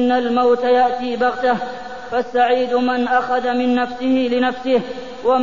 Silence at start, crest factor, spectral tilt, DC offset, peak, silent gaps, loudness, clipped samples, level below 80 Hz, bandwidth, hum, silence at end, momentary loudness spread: 0 s; 14 dB; -5.5 dB/octave; 1%; -4 dBFS; none; -18 LUFS; under 0.1%; -54 dBFS; 7.4 kHz; none; 0 s; 7 LU